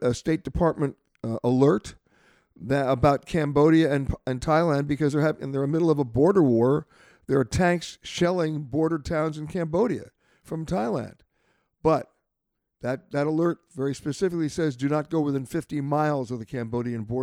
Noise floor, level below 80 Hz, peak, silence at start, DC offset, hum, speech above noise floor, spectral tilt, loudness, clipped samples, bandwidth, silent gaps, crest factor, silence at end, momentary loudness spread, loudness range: -81 dBFS; -48 dBFS; -8 dBFS; 0 s; under 0.1%; none; 57 dB; -7 dB/octave; -25 LUFS; under 0.1%; 14.5 kHz; none; 16 dB; 0 s; 10 LU; 6 LU